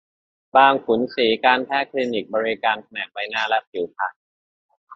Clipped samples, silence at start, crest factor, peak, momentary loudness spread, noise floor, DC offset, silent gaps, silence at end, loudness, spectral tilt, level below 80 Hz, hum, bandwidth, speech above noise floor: under 0.1%; 0.55 s; 20 dB; -2 dBFS; 12 LU; under -90 dBFS; under 0.1%; 3.67-3.72 s, 4.16-4.69 s, 4.77-4.87 s; 0 s; -21 LUFS; -5 dB/octave; -68 dBFS; none; 7.4 kHz; over 70 dB